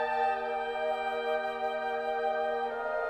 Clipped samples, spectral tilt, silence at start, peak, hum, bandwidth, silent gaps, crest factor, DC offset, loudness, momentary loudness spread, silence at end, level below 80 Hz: under 0.1%; -3.5 dB/octave; 0 s; -20 dBFS; none; 12 kHz; none; 12 dB; under 0.1%; -32 LUFS; 3 LU; 0 s; -66 dBFS